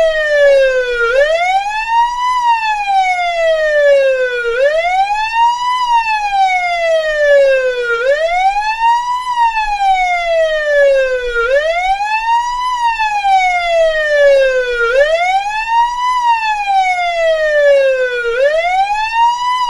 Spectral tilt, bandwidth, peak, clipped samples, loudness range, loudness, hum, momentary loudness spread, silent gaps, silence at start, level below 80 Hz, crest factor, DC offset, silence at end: 0 dB/octave; 11.5 kHz; 0 dBFS; under 0.1%; 1 LU; -12 LUFS; none; 5 LU; none; 0 s; -38 dBFS; 12 dB; under 0.1%; 0 s